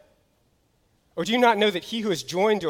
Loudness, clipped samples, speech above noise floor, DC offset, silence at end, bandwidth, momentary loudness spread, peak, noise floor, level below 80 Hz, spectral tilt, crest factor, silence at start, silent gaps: -23 LUFS; under 0.1%; 44 dB; under 0.1%; 0 s; 17 kHz; 11 LU; -8 dBFS; -66 dBFS; -64 dBFS; -4 dB/octave; 18 dB; 1.15 s; none